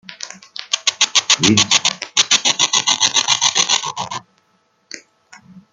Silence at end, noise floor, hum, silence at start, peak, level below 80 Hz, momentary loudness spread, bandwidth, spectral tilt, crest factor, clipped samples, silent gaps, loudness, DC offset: 0.15 s; -61 dBFS; none; 0.1 s; 0 dBFS; -62 dBFS; 20 LU; 13 kHz; -0.5 dB/octave; 18 dB; under 0.1%; none; -14 LUFS; under 0.1%